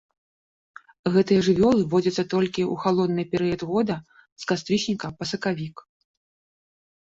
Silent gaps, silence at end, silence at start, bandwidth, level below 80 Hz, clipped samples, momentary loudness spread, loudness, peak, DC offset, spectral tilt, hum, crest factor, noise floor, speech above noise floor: 4.32-4.36 s; 1.2 s; 1.05 s; 7.8 kHz; -56 dBFS; under 0.1%; 11 LU; -24 LUFS; -8 dBFS; under 0.1%; -6 dB/octave; none; 16 dB; under -90 dBFS; over 67 dB